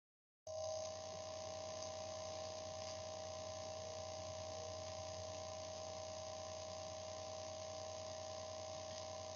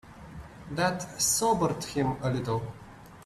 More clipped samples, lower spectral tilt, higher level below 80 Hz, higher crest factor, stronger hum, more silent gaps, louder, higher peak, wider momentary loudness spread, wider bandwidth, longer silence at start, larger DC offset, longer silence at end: neither; about the same, -3 dB/octave vs -4 dB/octave; second, -78 dBFS vs -54 dBFS; about the same, 18 dB vs 18 dB; neither; neither; second, -48 LUFS vs -28 LUFS; second, -32 dBFS vs -12 dBFS; second, 1 LU vs 21 LU; second, 10 kHz vs 15.5 kHz; first, 0.45 s vs 0.05 s; neither; about the same, 0 s vs 0 s